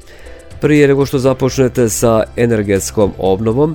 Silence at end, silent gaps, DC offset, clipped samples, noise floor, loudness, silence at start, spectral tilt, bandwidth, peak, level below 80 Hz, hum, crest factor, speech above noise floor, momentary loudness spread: 0 s; none; under 0.1%; under 0.1%; -34 dBFS; -13 LUFS; 0.05 s; -6 dB/octave; 19 kHz; 0 dBFS; -34 dBFS; none; 14 dB; 22 dB; 5 LU